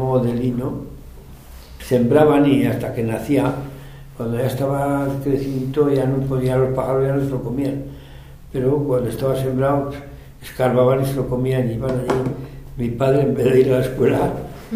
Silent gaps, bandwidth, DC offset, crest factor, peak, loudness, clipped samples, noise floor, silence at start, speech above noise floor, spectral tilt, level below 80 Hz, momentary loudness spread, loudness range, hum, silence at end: none; 16 kHz; under 0.1%; 18 dB; 0 dBFS; -19 LUFS; under 0.1%; -39 dBFS; 0 s; 21 dB; -8 dB/octave; -40 dBFS; 16 LU; 3 LU; none; 0 s